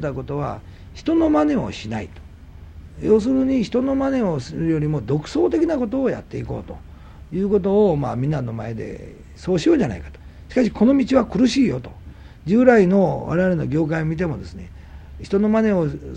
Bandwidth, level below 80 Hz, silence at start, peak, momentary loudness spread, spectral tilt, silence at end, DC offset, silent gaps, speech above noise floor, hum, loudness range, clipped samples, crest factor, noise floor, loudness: 9.2 kHz; -40 dBFS; 0 s; 0 dBFS; 18 LU; -7.5 dB/octave; 0 s; under 0.1%; none; 21 dB; none; 5 LU; under 0.1%; 20 dB; -40 dBFS; -20 LUFS